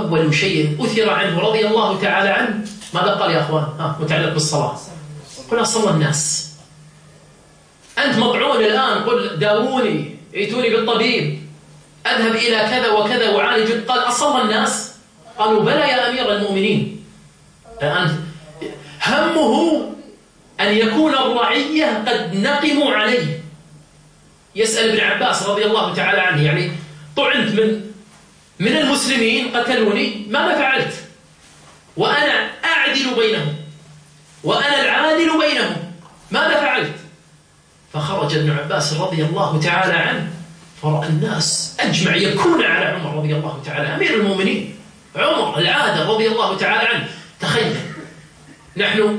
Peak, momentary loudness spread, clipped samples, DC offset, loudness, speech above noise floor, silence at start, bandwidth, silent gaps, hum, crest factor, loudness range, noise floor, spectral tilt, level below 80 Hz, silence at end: -4 dBFS; 12 LU; under 0.1%; under 0.1%; -17 LUFS; 34 dB; 0 s; 10.5 kHz; none; none; 16 dB; 3 LU; -51 dBFS; -4 dB/octave; -56 dBFS; 0 s